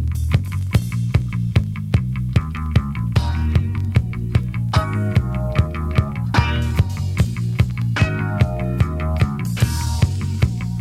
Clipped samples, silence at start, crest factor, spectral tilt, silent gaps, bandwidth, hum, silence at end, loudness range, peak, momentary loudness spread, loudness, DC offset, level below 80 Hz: under 0.1%; 0 s; 16 dB; -6.5 dB/octave; none; 15 kHz; none; 0 s; 1 LU; -2 dBFS; 2 LU; -20 LUFS; under 0.1%; -26 dBFS